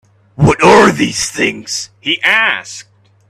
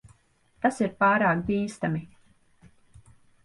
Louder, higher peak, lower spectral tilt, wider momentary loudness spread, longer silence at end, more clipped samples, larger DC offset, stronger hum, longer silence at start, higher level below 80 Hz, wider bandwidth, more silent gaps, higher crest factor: first, -11 LUFS vs -25 LUFS; first, 0 dBFS vs -10 dBFS; second, -4 dB/octave vs -6.5 dB/octave; first, 14 LU vs 9 LU; second, 0.5 s vs 1.4 s; neither; neither; neither; second, 0.4 s vs 0.65 s; first, -38 dBFS vs -58 dBFS; first, 14 kHz vs 11.5 kHz; neither; second, 12 dB vs 18 dB